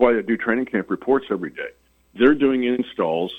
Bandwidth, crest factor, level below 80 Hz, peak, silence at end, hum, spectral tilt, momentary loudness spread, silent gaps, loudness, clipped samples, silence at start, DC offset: 4.1 kHz; 18 dB; -54 dBFS; -2 dBFS; 0 s; none; -7.5 dB/octave; 11 LU; none; -21 LUFS; under 0.1%; 0 s; under 0.1%